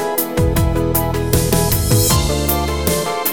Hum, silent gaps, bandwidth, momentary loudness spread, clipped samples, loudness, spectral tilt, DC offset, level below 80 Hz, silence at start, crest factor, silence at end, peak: none; none; over 20 kHz; 4 LU; under 0.1%; -16 LUFS; -4.5 dB/octave; 0.8%; -24 dBFS; 0 s; 16 dB; 0 s; 0 dBFS